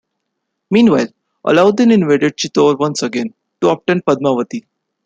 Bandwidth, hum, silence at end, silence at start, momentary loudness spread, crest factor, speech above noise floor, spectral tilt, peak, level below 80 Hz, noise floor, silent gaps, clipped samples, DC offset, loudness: 9 kHz; none; 0.45 s; 0.7 s; 12 LU; 14 dB; 61 dB; -5.5 dB/octave; -2 dBFS; -58 dBFS; -74 dBFS; none; under 0.1%; under 0.1%; -14 LUFS